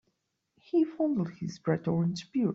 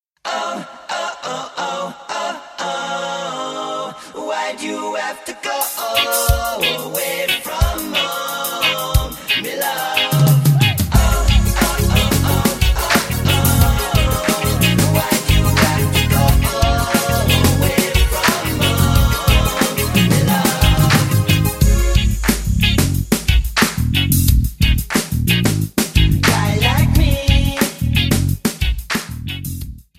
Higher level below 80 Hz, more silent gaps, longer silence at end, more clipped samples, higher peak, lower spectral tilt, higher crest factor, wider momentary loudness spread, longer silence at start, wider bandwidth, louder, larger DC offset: second, -70 dBFS vs -22 dBFS; neither; second, 0 s vs 0.2 s; neither; second, -14 dBFS vs 0 dBFS; first, -8 dB/octave vs -4.5 dB/octave; about the same, 16 dB vs 16 dB; second, 5 LU vs 10 LU; first, 0.75 s vs 0.25 s; second, 7.8 kHz vs 16.5 kHz; second, -30 LUFS vs -16 LUFS; neither